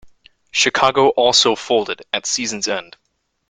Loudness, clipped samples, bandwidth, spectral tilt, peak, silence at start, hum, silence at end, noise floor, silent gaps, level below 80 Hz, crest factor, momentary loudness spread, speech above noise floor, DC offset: -16 LUFS; under 0.1%; 9.6 kHz; -1.5 dB/octave; 0 dBFS; 0.05 s; none; 0.65 s; -48 dBFS; none; -58 dBFS; 18 dB; 10 LU; 31 dB; under 0.1%